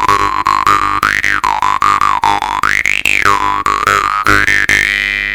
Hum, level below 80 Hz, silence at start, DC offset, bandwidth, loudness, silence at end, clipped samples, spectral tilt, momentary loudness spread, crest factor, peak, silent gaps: 50 Hz at -40 dBFS; -34 dBFS; 0 s; under 0.1%; 19.5 kHz; -11 LUFS; 0 s; 0.7%; -2 dB/octave; 4 LU; 12 dB; 0 dBFS; none